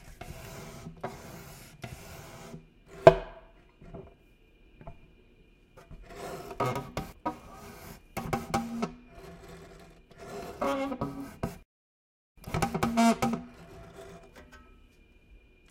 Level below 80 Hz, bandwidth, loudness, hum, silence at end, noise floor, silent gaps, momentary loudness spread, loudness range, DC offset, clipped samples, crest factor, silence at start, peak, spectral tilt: -52 dBFS; 16 kHz; -30 LUFS; none; 0.35 s; -60 dBFS; 11.65-12.35 s; 26 LU; 10 LU; under 0.1%; under 0.1%; 34 dB; 0 s; 0 dBFS; -5.5 dB/octave